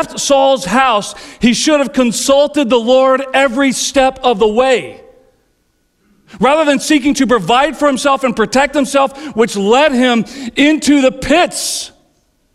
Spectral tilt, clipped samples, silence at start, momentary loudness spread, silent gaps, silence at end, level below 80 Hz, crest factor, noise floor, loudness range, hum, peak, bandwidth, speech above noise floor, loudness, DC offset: -3.5 dB/octave; under 0.1%; 0 s; 6 LU; none; 0.65 s; -42 dBFS; 12 dB; -60 dBFS; 3 LU; none; -2 dBFS; 15 kHz; 48 dB; -12 LUFS; under 0.1%